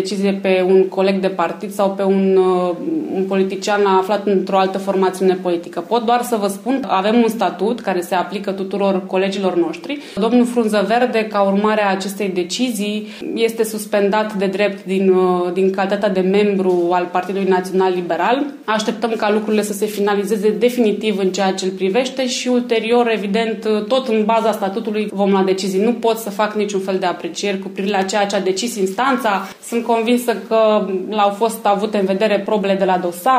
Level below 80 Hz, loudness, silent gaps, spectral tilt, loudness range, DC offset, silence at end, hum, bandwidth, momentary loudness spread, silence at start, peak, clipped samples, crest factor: -66 dBFS; -17 LUFS; none; -5 dB/octave; 2 LU; under 0.1%; 0 s; none; 15.5 kHz; 6 LU; 0 s; -4 dBFS; under 0.1%; 14 dB